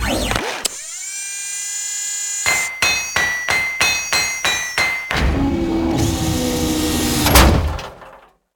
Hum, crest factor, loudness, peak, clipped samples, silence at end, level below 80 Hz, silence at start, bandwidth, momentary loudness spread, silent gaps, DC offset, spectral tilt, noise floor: none; 18 dB; -17 LUFS; 0 dBFS; under 0.1%; 0.4 s; -26 dBFS; 0 s; 18 kHz; 9 LU; none; under 0.1%; -3 dB/octave; -44 dBFS